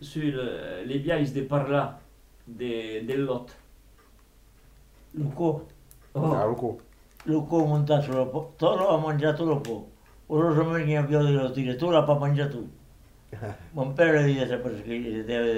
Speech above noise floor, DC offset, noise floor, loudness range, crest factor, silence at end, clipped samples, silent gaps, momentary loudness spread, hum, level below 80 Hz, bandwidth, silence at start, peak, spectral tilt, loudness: 30 dB; under 0.1%; -56 dBFS; 8 LU; 18 dB; 0 s; under 0.1%; none; 13 LU; none; -54 dBFS; 11 kHz; 0 s; -8 dBFS; -7.5 dB/octave; -26 LUFS